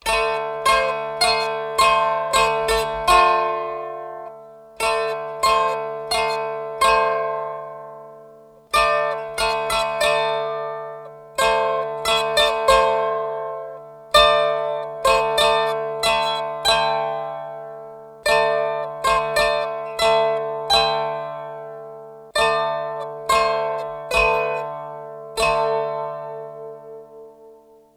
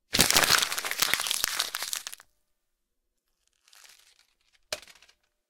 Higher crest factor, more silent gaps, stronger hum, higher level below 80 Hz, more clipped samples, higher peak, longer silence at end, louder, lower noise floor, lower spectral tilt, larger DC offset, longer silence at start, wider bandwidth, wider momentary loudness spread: second, 20 dB vs 28 dB; neither; neither; first, -46 dBFS vs -56 dBFS; neither; about the same, -2 dBFS vs -2 dBFS; second, 0.4 s vs 0.7 s; first, -20 LUFS vs -24 LUFS; second, -48 dBFS vs -79 dBFS; first, -1.5 dB/octave vs 0 dB/octave; neither; about the same, 0.05 s vs 0.1 s; about the same, 18 kHz vs 19 kHz; about the same, 17 LU vs 18 LU